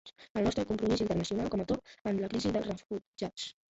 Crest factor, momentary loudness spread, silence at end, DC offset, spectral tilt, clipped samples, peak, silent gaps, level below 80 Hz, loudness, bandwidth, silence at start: 16 dB; 9 LU; 0.2 s; under 0.1%; -6 dB/octave; under 0.1%; -18 dBFS; 0.30-0.35 s, 2.01-2.05 s, 3.07-3.13 s; -54 dBFS; -34 LUFS; 8.2 kHz; 0.05 s